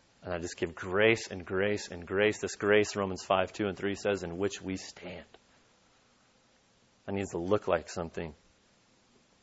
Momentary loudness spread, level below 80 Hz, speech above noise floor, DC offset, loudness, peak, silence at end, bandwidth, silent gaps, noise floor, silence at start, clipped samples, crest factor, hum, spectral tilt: 14 LU; -62 dBFS; 35 dB; under 0.1%; -31 LUFS; -10 dBFS; 1.1 s; 8 kHz; none; -67 dBFS; 0.2 s; under 0.1%; 24 dB; none; -4.5 dB/octave